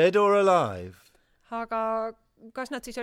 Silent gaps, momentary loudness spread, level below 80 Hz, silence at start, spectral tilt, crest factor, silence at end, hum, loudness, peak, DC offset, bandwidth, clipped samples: none; 19 LU; -62 dBFS; 0 s; -5.5 dB/octave; 16 dB; 0 s; none; -25 LUFS; -10 dBFS; under 0.1%; 14 kHz; under 0.1%